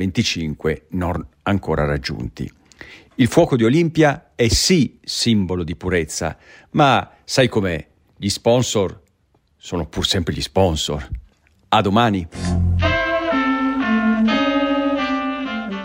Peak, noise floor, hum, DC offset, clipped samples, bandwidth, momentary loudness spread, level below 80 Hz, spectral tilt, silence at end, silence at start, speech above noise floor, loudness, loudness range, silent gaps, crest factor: 0 dBFS; -61 dBFS; none; under 0.1%; under 0.1%; 16 kHz; 10 LU; -36 dBFS; -5 dB/octave; 0 s; 0 s; 42 dB; -19 LUFS; 4 LU; none; 18 dB